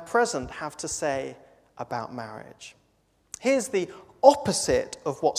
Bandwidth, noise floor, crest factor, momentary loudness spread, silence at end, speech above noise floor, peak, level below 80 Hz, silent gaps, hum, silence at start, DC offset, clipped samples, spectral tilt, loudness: 15.5 kHz; -67 dBFS; 26 dB; 22 LU; 0 s; 41 dB; 0 dBFS; -54 dBFS; none; none; 0 s; under 0.1%; under 0.1%; -3.5 dB/octave; -26 LUFS